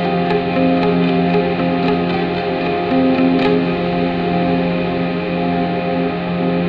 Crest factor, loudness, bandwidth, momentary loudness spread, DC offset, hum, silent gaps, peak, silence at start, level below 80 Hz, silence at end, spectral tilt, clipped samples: 12 dB; -17 LUFS; 5.4 kHz; 5 LU; under 0.1%; none; none; -4 dBFS; 0 s; -42 dBFS; 0 s; -9 dB/octave; under 0.1%